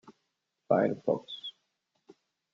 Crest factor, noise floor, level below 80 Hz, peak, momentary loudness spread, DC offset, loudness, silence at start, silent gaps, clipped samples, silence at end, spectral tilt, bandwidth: 24 dB; -82 dBFS; -76 dBFS; -12 dBFS; 14 LU; under 0.1%; -31 LUFS; 0.7 s; none; under 0.1%; 1.05 s; -7.5 dB/octave; 7.4 kHz